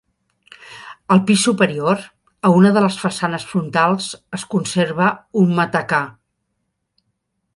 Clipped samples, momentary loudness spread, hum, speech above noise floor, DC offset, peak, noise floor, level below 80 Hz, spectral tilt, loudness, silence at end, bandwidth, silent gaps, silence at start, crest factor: under 0.1%; 15 LU; none; 56 dB; under 0.1%; -2 dBFS; -73 dBFS; -60 dBFS; -5.5 dB/octave; -17 LUFS; 1.45 s; 11.5 kHz; none; 0.65 s; 18 dB